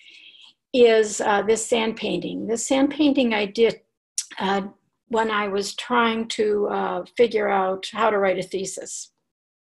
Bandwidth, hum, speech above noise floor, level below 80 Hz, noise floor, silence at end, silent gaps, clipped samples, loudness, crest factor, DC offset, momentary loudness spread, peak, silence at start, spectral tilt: 12.5 kHz; none; 29 dB; -62 dBFS; -50 dBFS; 0.75 s; 3.97-4.16 s; under 0.1%; -22 LUFS; 16 dB; under 0.1%; 11 LU; -6 dBFS; 0.25 s; -3.5 dB/octave